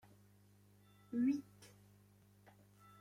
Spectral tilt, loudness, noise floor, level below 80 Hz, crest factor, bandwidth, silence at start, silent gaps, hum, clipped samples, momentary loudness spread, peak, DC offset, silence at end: -6.5 dB/octave; -40 LUFS; -68 dBFS; -82 dBFS; 18 dB; 15.5 kHz; 1.1 s; none; 50 Hz at -65 dBFS; under 0.1%; 27 LU; -28 dBFS; under 0.1%; 1.35 s